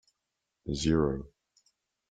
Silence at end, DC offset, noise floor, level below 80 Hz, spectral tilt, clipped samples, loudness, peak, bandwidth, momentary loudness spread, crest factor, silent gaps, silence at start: 0.85 s; under 0.1%; -85 dBFS; -48 dBFS; -6 dB/octave; under 0.1%; -30 LUFS; -14 dBFS; 9.4 kHz; 19 LU; 20 dB; none; 0.65 s